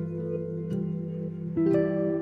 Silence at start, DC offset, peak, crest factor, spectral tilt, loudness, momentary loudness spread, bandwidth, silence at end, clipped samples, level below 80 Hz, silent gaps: 0 s; under 0.1%; -14 dBFS; 14 dB; -11 dB/octave; -29 LUFS; 9 LU; 5 kHz; 0 s; under 0.1%; -58 dBFS; none